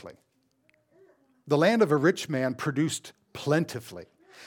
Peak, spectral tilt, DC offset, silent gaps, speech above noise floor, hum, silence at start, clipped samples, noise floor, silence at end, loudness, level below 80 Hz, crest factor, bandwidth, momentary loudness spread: -8 dBFS; -5.5 dB/octave; under 0.1%; none; 42 dB; none; 0.05 s; under 0.1%; -68 dBFS; 0 s; -26 LUFS; -74 dBFS; 20 dB; 18.5 kHz; 19 LU